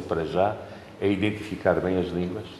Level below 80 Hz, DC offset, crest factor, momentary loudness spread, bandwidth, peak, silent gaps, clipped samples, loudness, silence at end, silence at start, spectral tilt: -52 dBFS; under 0.1%; 20 dB; 6 LU; 13 kHz; -6 dBFS; none; under 0.1%; -26 LUFS; 0 s; 0 s; -7.5 dB/octave